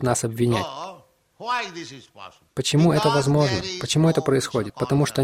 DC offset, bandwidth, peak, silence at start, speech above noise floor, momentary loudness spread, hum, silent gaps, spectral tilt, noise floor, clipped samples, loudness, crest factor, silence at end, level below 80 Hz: under 0.1%; 15.5 kHz; -6 dBFS; 0 s; 27 dB; 17 LU; none; none; -5.5 dB/octave; -49 dBFS; under 0.1%; -22 LUFS; 16 dB; 0 s; -52 dBFS